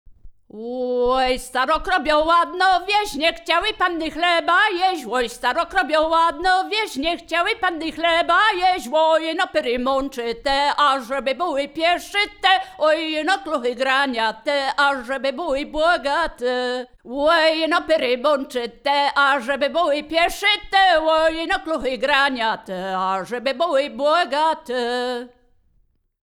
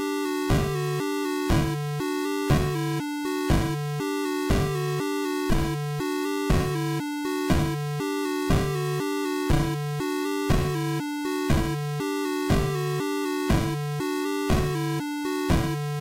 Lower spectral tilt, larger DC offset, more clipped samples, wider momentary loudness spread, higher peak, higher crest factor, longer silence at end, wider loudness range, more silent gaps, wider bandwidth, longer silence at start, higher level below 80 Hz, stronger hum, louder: second, -2.5 dB/octave vs -6 dB/octave; neither; neither; first, 7 LU vs 4 LU; first, -2 dBFS vs -14 dBFS; first, 18 dB vs 12 dB; first, 1.1 s vs 0 s; about the same, 2 LU vs 0 LU; neither; first, 18.5 kHz vs 16.5 kHz; about the same, 0.1 s vs 0 s; second, -46 dBFS vs -36 dBFS; neither; first, -19 LUFS vs -26 LUFS